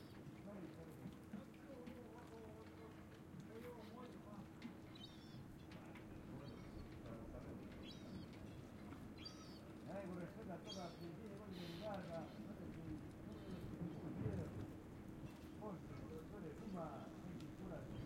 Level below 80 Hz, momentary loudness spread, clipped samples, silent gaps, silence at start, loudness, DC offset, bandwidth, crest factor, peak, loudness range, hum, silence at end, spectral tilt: -68 dBFS; 7 LU; under 0.1%; none; 0 s; -54 LUFS; under 0.1%; 16 kHz; 20 dB; -34 dBFS; 5 LU; none; 0 s; -6.5 dB/octave